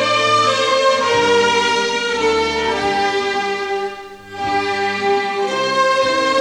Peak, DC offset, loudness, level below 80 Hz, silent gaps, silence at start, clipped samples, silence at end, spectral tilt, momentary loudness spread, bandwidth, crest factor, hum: -4 dBFS; under 0.1%; -16 LUFS; -48 dBFS; none; 0 s; under 0.1%; 0 s; -2.5 dB/octave; 7 LU; 12.5 kHz; 14 dB; none